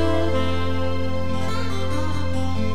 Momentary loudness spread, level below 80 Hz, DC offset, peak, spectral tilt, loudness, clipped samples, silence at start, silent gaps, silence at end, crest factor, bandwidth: 4 LU; -36 dBFS; 9%; -8 dBFS; -6.5 dB/octave; -25 LUFS; under 0.1%; 0 s; none; 0 s; 12 dB; 13 kHz